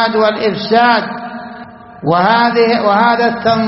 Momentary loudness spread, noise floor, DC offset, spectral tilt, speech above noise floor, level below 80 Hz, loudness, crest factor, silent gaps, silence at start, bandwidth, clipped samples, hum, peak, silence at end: 16 LU; -33 dBFS; under 0.1%; -7.5 dB/octave; 21 dB; -52 dBFS; -12 LUFS; 12 dB; none; 0 s; 6 kHz; under 0.1%; none; 0 dBFS; 0 s